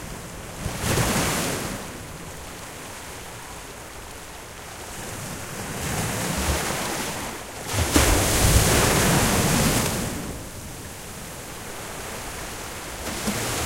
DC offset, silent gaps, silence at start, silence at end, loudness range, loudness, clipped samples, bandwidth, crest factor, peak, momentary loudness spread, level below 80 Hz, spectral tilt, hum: under 0.1%; none; 0 s; 0 s; 15 LU; -24 LUFS; under 0.1%; 16 kHz; 22 dB; -4 dBFS; 18 LU; -34 dBFS; -3.5 dB/octave; none